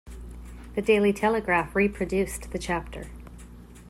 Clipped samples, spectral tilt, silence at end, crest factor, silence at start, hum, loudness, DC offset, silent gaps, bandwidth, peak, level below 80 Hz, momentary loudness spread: under 0.1%; -5.5 dB/octave; 0 s; 18 dB; 0.05 s; 60 Hz at -55 dBFS; -25 LUFS; under 0.1%; none; 15 kHz; -10 dBFS; -42 dBFS; 22 LU